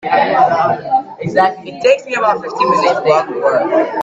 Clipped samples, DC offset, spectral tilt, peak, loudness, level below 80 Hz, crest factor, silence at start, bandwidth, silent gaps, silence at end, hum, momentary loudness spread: under 0.1%; under 0.1%; -5 dB/octave; 0 dBFS; -14 LUFS; -58 dBFS; 14 dB; 0.05 s; 8 kHz; none; 0 s; none; 5 LU